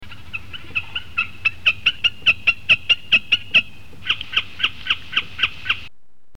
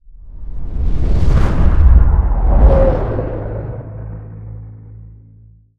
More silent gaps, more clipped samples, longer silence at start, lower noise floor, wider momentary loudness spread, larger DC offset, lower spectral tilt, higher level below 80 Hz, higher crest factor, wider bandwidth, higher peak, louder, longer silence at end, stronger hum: neither; neither; about the same, 0 s vs 0.1 s; first, -50 dBFS vs -44 dBFS; second, 13 LU vs 22 LU; first, 2% vs under 0.1%; second, -1.5 dB/octave vs -9.5 dB/octave; second, -48 dBFS vs -14 dBFS; about the same, 18 dB vs 14 dB; first, 17 kHz vs 5 kHz; second, -4 dBFS vs 0 dBFS; second, -18 LUFS vs -15 LUFS; second, 0.5 s vs 0.7 s; neither